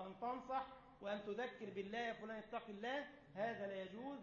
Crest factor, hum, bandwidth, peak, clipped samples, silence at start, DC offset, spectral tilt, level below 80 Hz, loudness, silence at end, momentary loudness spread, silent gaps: 16 dB; none; 7 kHz; -32 dBFS; under 0.1%; 0 s; under 0.1%; -3 dB/octave; -78 dBFS; -48 LUFS; 0 s; 6 LU; none